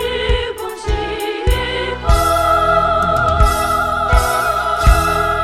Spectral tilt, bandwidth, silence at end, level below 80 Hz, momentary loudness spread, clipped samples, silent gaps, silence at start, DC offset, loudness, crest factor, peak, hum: -4.5 dB/octave; 15.5 kHz; 0 s; -20 dBFS; 7 LU; under 0.1%; none; 0 s; under 0.1%; -15 LUFS; 14 dB; 0 dBFS; none